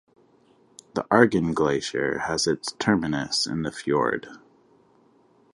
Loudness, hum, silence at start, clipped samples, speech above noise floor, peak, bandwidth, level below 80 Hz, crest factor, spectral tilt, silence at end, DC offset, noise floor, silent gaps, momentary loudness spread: -24 LUFS; none; 0.95 s; under 0.1%; 36 dB; -2 dBFS; 11.5 kHz; -56 dBFS; 24 dB; -4.5 dB/octave; 1.15 s; under 0.1%; -60 dBFS; none; 11 LU